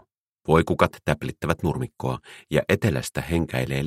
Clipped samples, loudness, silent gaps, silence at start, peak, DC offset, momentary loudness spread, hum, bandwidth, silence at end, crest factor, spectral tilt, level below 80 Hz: under 0.1%; -24 LUFS; none; 0.5 s; -2 dBFS; under 0.1%; 9 LU; none; 16 kHz; 0 s; 22 dB; -6 dB/octave; -42 dBFS